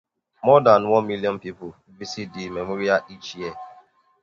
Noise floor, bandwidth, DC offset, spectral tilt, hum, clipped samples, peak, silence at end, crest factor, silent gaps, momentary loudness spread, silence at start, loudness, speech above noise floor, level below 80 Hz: -53 dBFS; 7.2 kHz; under 0.1%; -6 dB/octave; none; under 0.1%; 0 dBFS; 0.5 s; 22 dB; none; 22 LU; 0.45 s; -21 LUFS; 32 dB; -60 dBFS